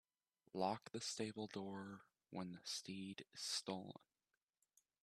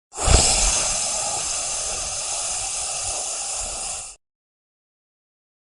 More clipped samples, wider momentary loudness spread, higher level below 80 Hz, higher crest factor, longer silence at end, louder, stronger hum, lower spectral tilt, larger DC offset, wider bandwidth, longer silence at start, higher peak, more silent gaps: neither; about the same, 12 LU vs 10 LU; second, -88 dBFS vs -32 dBFS; about the same, 24 dB vs 22 dB; second, 1.1 s vs 1.55 s; second, -48 LUFS vs -21 LUFS; neither; first, -3.5 dB/octave vs -1.5 dB/octave; neither; first, 14 kHz vs 11.5 kHz; first, 0.55 s vs 0.15 s; second, -26 dBFS vs -2 dBFS; neither